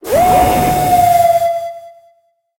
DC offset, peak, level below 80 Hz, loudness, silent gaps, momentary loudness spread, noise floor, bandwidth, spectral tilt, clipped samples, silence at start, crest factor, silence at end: under 0.1%; -2 dBFS; -34 dBFS; -12 LUFS; none; 9 LU; -56 dBFS; 17 kHz; -5 dB/octave; under 0.1%; 0.05 s; 12 dB; 0.7 s